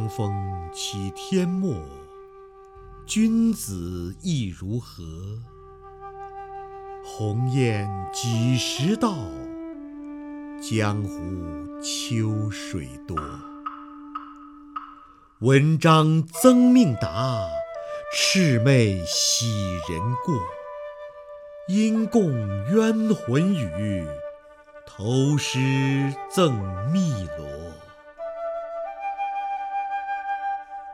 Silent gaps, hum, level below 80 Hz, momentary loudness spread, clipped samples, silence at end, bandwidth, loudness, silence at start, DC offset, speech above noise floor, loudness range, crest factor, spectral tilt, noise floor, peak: none; none; -50 dBFS; 20 LU; under 0.1%; 0 s; 16 kHz; -24 LUFS; 0 s; under 0.1%; 27 dB; 11 LU; 24 dB; -5.5 dB/octave; -49 dBFS; 0 dBFS